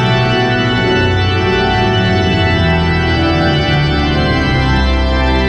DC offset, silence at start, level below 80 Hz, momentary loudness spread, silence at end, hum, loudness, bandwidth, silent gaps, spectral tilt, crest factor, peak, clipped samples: under 0.1%; 0 s; -20 dBFS; 1 LU; 0 s; none; -12 LUFS; 8.4 kHz; none; -6.5 dB/octave; 10 dB; -2 dBFS; under 0.1%